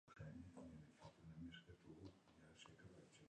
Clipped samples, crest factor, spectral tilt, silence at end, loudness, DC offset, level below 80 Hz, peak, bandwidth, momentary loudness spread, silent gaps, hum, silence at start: under 0.1%; 16 dB; -6 dB/octave; 0 s; -62 LUFS; under 0.1%; -74 dBFS; -46 dBFS; 10 kHz; 7 LU; none; none; 0.05 s